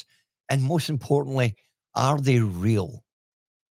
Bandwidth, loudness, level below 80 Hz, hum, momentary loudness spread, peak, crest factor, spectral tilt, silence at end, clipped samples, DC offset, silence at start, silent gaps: 16 kHz; -24 LUFS; -64 dBFS; none; 6 LU; -6 dBFS; 18 dB; -6.5 dB/octave; 0.75 s; under 0.1%; under 0.1%; 0.5 s; none